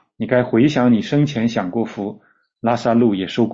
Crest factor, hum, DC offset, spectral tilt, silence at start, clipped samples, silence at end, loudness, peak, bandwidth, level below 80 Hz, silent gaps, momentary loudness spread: 14 dB; none; under 0.1%; -7 dB/octave; 0.2 s; under 0.1%; 0 s; -18 LUFS; -4 dBFS; 7.6 kHz; -54 dBFS; none; 10 LU